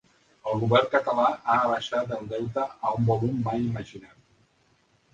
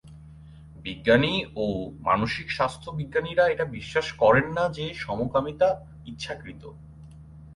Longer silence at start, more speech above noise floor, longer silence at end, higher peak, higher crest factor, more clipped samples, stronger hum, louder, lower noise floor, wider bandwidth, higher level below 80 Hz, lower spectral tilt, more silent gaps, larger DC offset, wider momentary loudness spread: first, 0.45 s vs 0.05 s; first, 40 dB vs 21 dB; first, 1.05 s vs 0 s; about the same, -6 dBFS vs -6 dBFS; about the same, 22 dB vs 20 dB; neither; neither; about the same, -26 LUFS vs -25 LUFS; first, -65 dBFS vs -46 dBFS; second, 7.8 kHz vs 11.5 kHz; second, -58 dBFS vs -50 dBFS; about the same, -7 dB/octave vs -6 dB/octave; neither; neither; second, 9 LU vs 17 LU